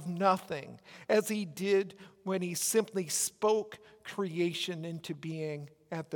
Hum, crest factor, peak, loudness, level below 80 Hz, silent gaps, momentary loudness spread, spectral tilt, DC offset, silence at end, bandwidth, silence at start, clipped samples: none; 20 dB; -14 dBFS; -33 LUFS; -80 dBFS; none; 14 LU; -4 dB/octave; under 0.1%; 0 s; 18 kHz; 0 s; under 0.1%